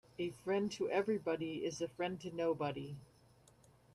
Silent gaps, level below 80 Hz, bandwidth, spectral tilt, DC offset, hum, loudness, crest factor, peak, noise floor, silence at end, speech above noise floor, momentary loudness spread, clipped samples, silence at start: none; -74 dBFS; 13 kHz; -5.5 dB/octave; under 0.1%; none; -39 LUFS; 18 dB; -22 dBFS; -67 dBFS; 0.9 s; 28 dB; 8 LU; under 0.1%; 0.2 s